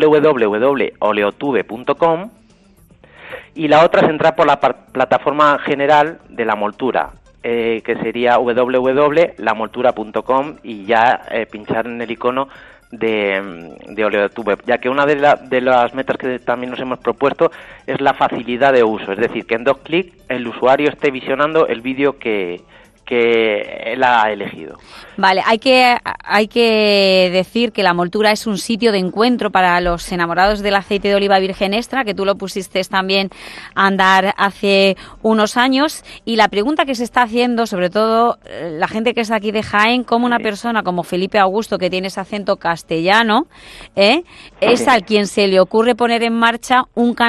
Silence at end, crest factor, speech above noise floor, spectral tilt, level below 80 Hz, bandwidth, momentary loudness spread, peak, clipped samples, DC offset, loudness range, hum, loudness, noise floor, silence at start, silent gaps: 0 s; 16 dB; 34 dB; -4.5 dB/octave; -46 dBFS; 13 kHz; 9 LU; 0 dBFS; under 0.1%; under 0.1%; 4 LU; none; -15 LUFS; -49 dBFS; 0 s; none